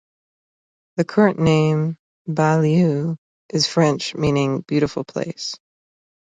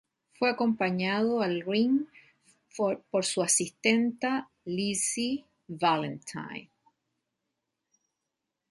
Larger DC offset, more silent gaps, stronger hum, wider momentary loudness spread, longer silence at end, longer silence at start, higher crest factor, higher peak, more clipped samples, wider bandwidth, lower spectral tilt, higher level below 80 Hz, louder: neither; first, 1.99-2.25 s, 3.18-3.49 s vs none; neither; about the same, 13 LU vs 13 LU; second, 0.8 s vs 2.1 s; first, 0.95 s vs 0.4 s; second, 18 dB vs 24 dB; first, -2 dBFS vs -8 dBFS; neither; second, 9.2 kHz vs 11.5 kHz; first, -6 dB/octave vs -3.5 dB/octave; first, -52 dBFS vs -74 dBFS; first, -20 LUFS vs -28 LUFS